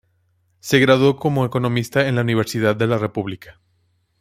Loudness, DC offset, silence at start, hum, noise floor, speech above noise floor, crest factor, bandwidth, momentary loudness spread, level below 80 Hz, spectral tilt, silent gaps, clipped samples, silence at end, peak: -18 LUFS; under 0.1%; 0.65 s; none; -64 dBFS; 46 dB; 18 dB; 16 kHz; 13 LU; -54 dBFS; -6 dB/octave; none; under 0.1%; 0.7 s; -2 dBFS